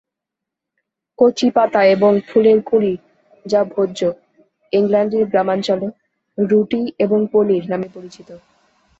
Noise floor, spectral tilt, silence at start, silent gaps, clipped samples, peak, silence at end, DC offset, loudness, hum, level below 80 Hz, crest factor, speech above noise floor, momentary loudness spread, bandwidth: -83 dBFS; -6.5 dB/octave; 1.2 s; none; under 0.1%; -2 dBFS; 0.65 s; under 0.1%; -16 LUFS; none; -60 dBFS; 16 dB; 67 dB; 13 LU; 7.8 kHz